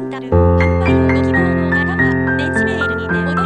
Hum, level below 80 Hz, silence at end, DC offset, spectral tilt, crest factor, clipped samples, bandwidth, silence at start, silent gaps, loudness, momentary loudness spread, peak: none; -30 dBFS; 0 s; under 0.1%; -8 dB/octave; 12 dB; under 0.1%; 9.4 kHz; 0 s; none; -15 LUFS; 4 LU; -2 dBFS